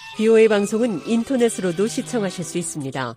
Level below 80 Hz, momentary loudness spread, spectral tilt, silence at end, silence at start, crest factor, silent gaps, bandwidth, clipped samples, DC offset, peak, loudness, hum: -62 dBFS; 11 LU; -5 dB/octave; 0 s; 0 s; 16 dB; none; 15.5 kHz; under 0.1%; under 0.1%; -4 dBFS; -20 LUFS; none